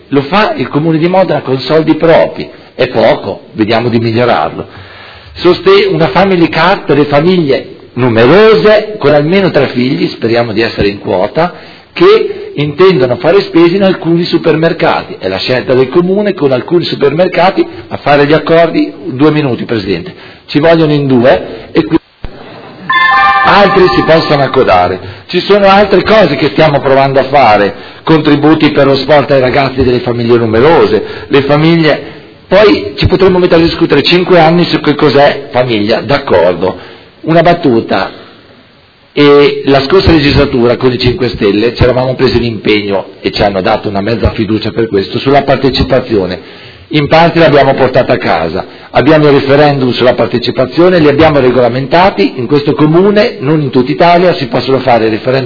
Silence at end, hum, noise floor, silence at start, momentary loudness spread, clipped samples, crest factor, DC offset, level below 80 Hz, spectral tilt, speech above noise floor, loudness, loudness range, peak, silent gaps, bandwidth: 0 s; none; -42 dBFS; 0.1 s; 8 LU; 3%; 8 dB; under 0.1%; -32 dBFS; -8 dB/octave; 34 dB; -8 LUFS; 3 LU; 0 dBFS; none; 5.4 kHz